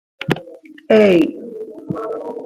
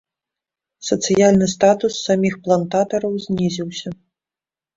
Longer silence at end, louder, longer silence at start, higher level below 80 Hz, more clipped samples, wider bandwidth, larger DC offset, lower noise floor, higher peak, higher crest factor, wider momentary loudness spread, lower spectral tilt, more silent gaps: second, 0 s vs 0.8 s; about the same, -17 LUFS vs -18 LUFS; second, 0.2 s vs 0.8 s; about the same, -56 dBFS vs -54 dBFS; neither; first, 15 kHz vs 7.8 kHz; neither; second, -39 dBFS vs under -90 dBFS; about the same, -2 dBFS vs -2 dBFS; about the same, 16 dB vs 18 dB; first, 19 LU vs 13 LU; first, -7 dB/octave vs -5 dB/octave; neither